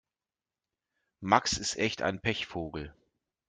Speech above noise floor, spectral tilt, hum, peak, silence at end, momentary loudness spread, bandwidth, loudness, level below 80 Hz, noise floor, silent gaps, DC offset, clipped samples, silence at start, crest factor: over 59 dB; -3 dB/octave; none; -6 dBFS; 0.55 s; 16 LU; 11 kHz; -30 LUFS; -58 dBFS; under -90 dBFS; none; under 0.1%; under 0.1%; 1.2 s; 26 dB